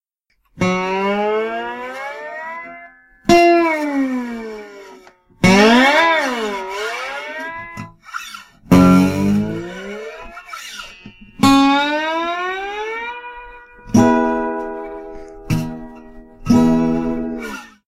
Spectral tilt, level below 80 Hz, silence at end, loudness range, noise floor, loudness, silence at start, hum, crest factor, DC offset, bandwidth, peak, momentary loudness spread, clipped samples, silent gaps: -5.5 dB/octave; -42 dBFS; 0.2 s; 5 LU; -65 dBFS; -16 LUFS; 0.55 s; none; 18 dB; under 0.1%; 16 kHz; 0 dBFS; 21 LU; under 0.1%; none